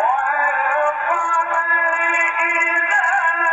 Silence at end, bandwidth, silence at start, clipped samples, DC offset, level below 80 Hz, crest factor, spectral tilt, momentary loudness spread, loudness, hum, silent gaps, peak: 0 s; 8.2 kHz; 0 s; under 0.1%; under 0.1%; -70 dBFS; 12 dB; -1.5 dB/octave; 3 LU; -16 LUFS; none; none; -6 dBFS